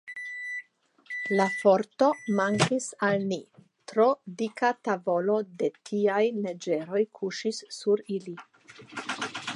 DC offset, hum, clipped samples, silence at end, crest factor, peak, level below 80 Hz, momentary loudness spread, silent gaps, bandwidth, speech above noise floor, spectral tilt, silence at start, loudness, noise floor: under 0.1%; none; under 0.1%; 0 s; 20 dB; -8 dBFS; -74 dBFS; 12 LU; none; 11.5 kHz; 31 dB; -5 dB/octave; 0.05 s; -28 LUFS; -58 dBFS